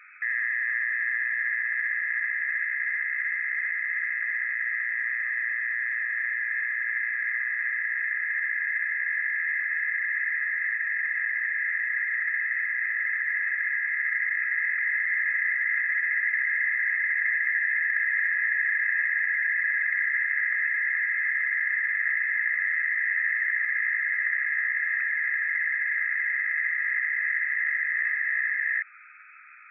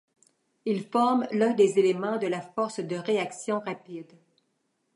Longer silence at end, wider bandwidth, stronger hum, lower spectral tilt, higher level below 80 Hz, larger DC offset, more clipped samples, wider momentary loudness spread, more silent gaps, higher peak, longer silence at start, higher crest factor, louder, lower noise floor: second, 0 s vs 0.95 s; second, 2.8 kHz vs 11 kHz; neither; second, 8 dB/octave vs -5.5 dB/octave; second, under -90 dBFS vs -80 dBFS; neither; neither; second, 3 LU vs 15 LU; neither; second, -14 dBFS vs -10 dBFS; second, 0 s vs 0.65 s; second, 12 dB vs 18 dB; about the same, -25 LUFS vs -27 LUFS; second, -50 dBFS vs -75 dBFS